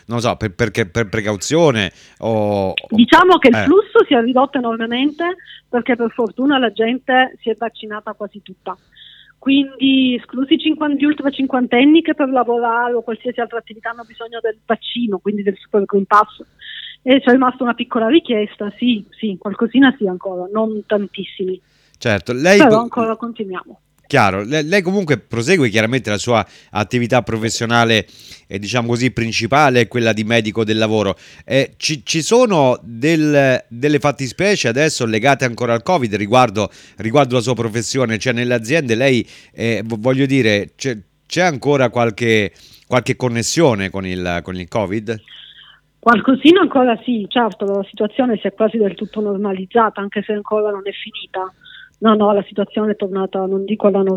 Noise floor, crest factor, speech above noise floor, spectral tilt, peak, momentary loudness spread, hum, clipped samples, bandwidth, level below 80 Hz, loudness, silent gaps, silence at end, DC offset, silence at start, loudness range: -46 dBFS; 16 dB; 30 dB; -5 dB/octave; 0 dBFS; 12 LU; none; under 0.1%; 15 kHz; -52 dBFS; -16 LUFS; none; 0 s; under 0.1%; 0.1 s; 5 LU